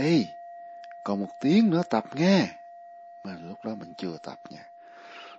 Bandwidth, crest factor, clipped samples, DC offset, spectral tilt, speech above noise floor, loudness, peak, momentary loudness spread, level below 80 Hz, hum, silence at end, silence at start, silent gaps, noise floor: 7.8 kHz; 20 dB; under 0.1%; under 0.1%; -6.5 dB/octave; 21 dB; -26 LUFS; -8 dBFS; 24 LU; -74 dBFS; none; 0 s; 0 s; none; -47 dBFS